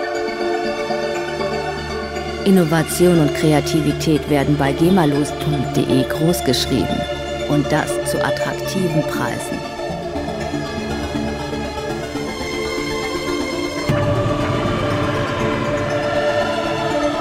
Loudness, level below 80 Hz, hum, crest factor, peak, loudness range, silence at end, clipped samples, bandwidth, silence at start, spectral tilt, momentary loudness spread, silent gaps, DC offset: -19 LUFS; -36 dBFS; none; 16 dB; -2 dBFS; 7 LU; 0 s; under 0.1%; 16 kHz; 0 s; -5.5 dB/octave; 9 LU; none; under 0.1%